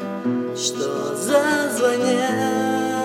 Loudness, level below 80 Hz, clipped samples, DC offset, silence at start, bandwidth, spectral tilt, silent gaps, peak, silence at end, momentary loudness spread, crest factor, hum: -21 LUFS; -74 dBFS; under 0.1%; under 0.1%; 0 s; 16.5 kHz; -3.5 dB/octave; none; -6 dBFS; 0 s; 6 LU; 14 dB; none